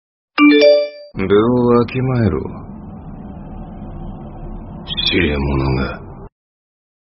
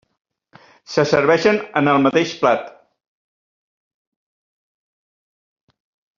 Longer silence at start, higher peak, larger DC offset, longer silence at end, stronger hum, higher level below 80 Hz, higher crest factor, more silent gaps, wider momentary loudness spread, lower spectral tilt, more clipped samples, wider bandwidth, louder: second, 0.35 s vs 0.9 s; about the same, 0 dBFS vs 0 dBFS; neither; second, 0.8 s vs 3.5 s; neither; first, -32 dBFS vs -62 dBFS; about the same, 18 dB vs 22 dB; neither; first, 22 LU vs 8 LU; about the same, -5 dB/octave vs -4 dB/octave; neither; second, 5.8 kHz vs 7.4 kHz; about the same, -15 LUFS vs -17 LUFS